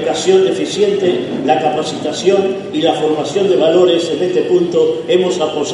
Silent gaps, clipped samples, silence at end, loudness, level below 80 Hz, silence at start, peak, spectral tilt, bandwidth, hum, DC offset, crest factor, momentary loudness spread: none; under 0.1%; 0 s; -14 LUFS; -60 dBFS; 0 s; 0 dBFS; -5 dB/octave; 10.5 kHz; none; under 0.1%; 14 dB; 5 LU